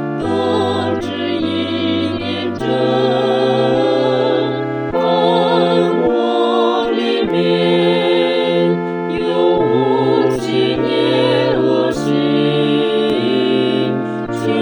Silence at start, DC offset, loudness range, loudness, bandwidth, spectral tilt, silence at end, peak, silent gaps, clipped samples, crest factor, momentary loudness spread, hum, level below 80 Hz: 0 s; under 0.1%; 2 LU; -15 LUFS; 19.5 kHz; -6.5 dB/octave; 0 s; -2 dBFS; none; under 0.1%; 14 dB; 6 LU; none; -50 dBFS